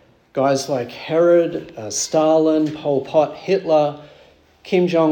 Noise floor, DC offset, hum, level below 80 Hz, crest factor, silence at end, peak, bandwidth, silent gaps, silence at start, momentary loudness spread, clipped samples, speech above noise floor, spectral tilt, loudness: -50 dBFS; under 0.1%; none; -62 dBFS; 14 dB; 0 s; -4 dBFS; 18 kHz; none; 0.35 s; 9 LU; under 0.1%; 33 dB; -5 dB/octave; -18 LUFS